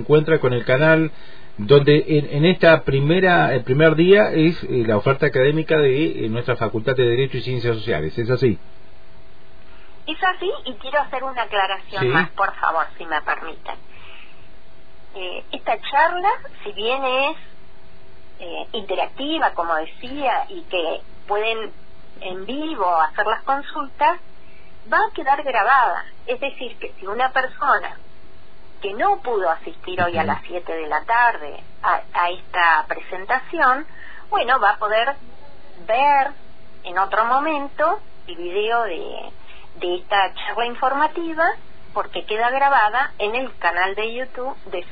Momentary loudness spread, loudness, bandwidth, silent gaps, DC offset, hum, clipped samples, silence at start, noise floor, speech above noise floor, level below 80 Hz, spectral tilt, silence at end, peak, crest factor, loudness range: 15 LU; -20 LUFS; 5 kHz; none; 4%; none; under 0.1%; 0 s; -49 dBFS; 29 dB; -50 dBFS; -8.5 dB/octave; 0.05 s; 0 dBFS; 20 dB; 8 LU